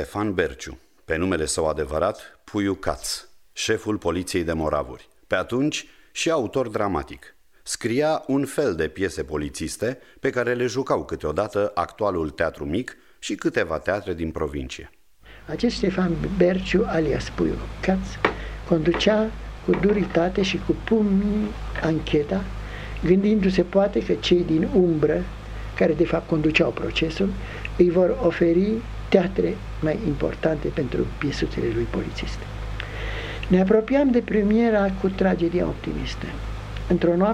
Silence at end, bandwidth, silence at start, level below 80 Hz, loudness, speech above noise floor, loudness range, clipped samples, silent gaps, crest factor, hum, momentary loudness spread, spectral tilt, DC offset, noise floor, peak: 0 s; 14 kHz; 0 s; -38 dBFS; -23 LUFS; 26 dB; 5 LU; under 0.1%; none; 22 dB; none; 12 LU; -6 dB/octave; 0.1%; -48 dBFS; -2 dBFS